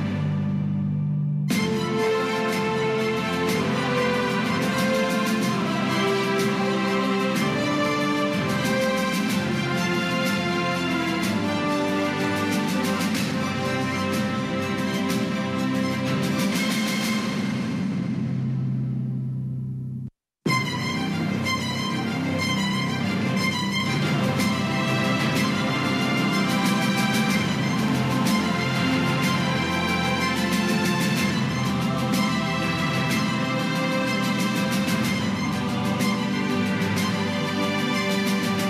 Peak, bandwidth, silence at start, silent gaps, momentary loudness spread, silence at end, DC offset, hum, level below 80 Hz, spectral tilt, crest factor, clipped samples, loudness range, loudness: -10 dBFS; 15.5 kHz; 0 s; none; 4 LU; 0 s; under 0.1%; none; -56 dBFS; -5 dB/octave; 14 dB; under 0.1%; 3 LU; -24 LUFS